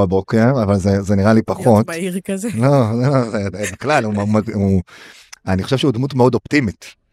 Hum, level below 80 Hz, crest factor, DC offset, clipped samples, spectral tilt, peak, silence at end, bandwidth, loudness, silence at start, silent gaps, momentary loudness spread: none; -48 dBFS; 16 dB; under 0.1%; under 0.1%; -7 dB/octave; 0 dBFS; 0.2 s; 14 kHz; -16 LUFS; 0 s; none; 8 LU